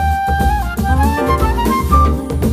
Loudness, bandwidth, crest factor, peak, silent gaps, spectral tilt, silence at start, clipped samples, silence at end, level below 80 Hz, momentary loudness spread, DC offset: -15 LUFS; 15.5 kHz; 14 dB; 0 dBFS; none; -6.5 dB/octave; 0 s; under 0.1%; 0 s; -18 dBFS; 4 LU; under 0.1%